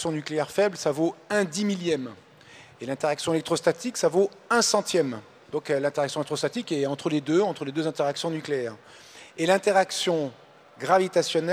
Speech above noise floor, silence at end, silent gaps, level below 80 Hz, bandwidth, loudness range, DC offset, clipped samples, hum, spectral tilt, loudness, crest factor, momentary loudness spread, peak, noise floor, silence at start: 25 dB; 0 s; none; -72 dBFS; 15.5 kHz; 2 LU; under 0.1%; under 0.1%; none; -4 dB/octave; -26 LUFS; 18 dB; 12 LU; -8 dBFS; -50 dBFS; 0 s